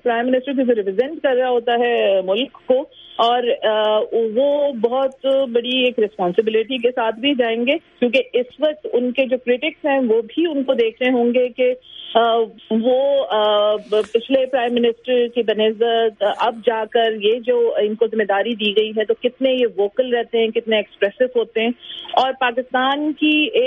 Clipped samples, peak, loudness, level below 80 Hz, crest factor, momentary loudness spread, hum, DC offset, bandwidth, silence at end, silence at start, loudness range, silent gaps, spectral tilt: under 0.1%; -2 dBFS; -18 LUFS; -66 dBFS; 16 dB; 4 LU; none; under 0.1%; 5.6 kHz; 0 s; 0.05 s; 1 LU; none; -6 dB/octave